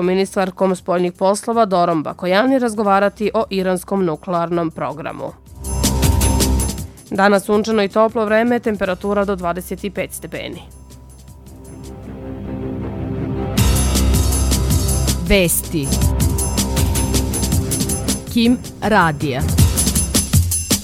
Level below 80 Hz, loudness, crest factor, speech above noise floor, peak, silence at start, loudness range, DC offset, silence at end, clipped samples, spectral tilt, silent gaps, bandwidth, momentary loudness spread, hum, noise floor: -26 dBFS; -17 LUFS; 16 dB; 22 dB; 0 dBFS; 0 s; 8 LU; under 0.1%; 0 s; under 0.1%; -4.5 dB/octave; none; 18 kHz; 12 LU; none; -39 dBFS